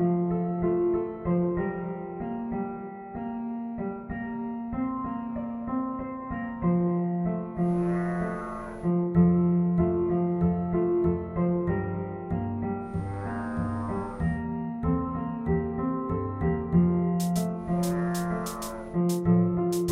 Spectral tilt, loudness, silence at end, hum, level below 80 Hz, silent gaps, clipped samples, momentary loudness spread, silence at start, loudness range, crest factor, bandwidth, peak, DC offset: -8 dB/octave; -28 LUFS; 0 s; none; -46 dBFS; none; under 0.1%; 10 LU; 0 s; 7 LU; 16 dB; 14.5 kHz; -12 dBFS; under 0.1%